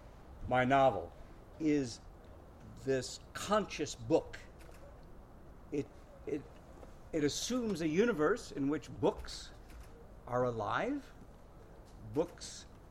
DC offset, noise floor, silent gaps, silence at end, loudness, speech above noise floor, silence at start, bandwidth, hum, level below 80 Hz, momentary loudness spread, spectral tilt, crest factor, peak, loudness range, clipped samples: under 0.1%; -55 dBFS; none; 0 s; -35 LUFS; 20 dB; 0 s; 15.5 kHz; none; -56 dBFS; 24 LU; -5 dB/octave; 20 dB; -16 dBFS; 6 LU; under 0.1%